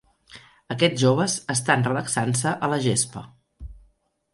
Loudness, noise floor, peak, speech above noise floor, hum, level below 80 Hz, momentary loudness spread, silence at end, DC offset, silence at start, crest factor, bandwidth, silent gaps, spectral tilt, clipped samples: -22 LUFS; -63 dBFS; -4 dBFS; 40 dB; none; -52 dBFS; 6 LU; 0.55 s; under 0.1%; 0.35 s; 22 dB; 11.5 kHz; none; -4 dB/octave; under 0.1%